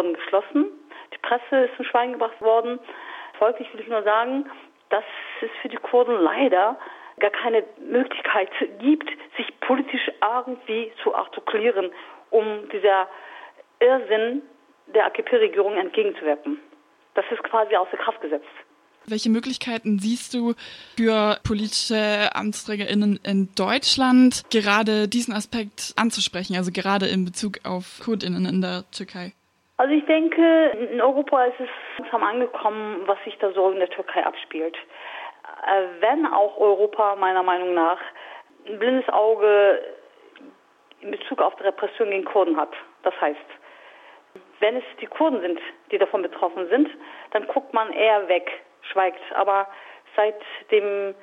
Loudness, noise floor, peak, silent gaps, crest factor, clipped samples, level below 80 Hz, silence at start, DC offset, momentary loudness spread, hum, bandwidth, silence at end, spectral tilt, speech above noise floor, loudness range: -22 LUFS; -55 dBFS; -4 dBFS; none; 20 dB; under 0.1%; -60 dBFS; 0 s; under 0.1%; 14 LU; none; 13 kHz; 0.1 s; -4.5 dB/octave; 33 dB; 5 LU